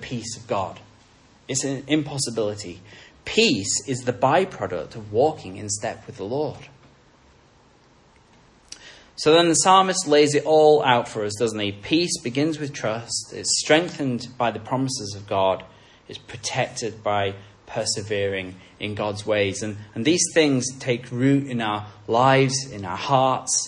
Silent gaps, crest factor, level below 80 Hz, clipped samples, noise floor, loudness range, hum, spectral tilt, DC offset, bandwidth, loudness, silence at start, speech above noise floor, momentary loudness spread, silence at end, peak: none; 20 dB; -60 dBFS; under 0.1%; -55 dBFS; 9 LU; none; -3.5 dB/octave; under 0.1%; 11.5 kHz; -22 LUFS; 0 s; 33 dB; 15 LU; 0 s; -2 dBFS